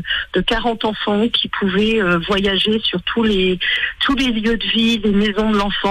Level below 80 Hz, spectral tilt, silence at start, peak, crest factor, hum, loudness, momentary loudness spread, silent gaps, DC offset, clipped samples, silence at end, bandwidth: -34 dBFS; -5.5 dB/octave; 0 s; -6 dBFS; 10 dB; none; -17 LUFS; 3 LU; none; under 0.1%; under 0.1%; 0 s; 11 kHz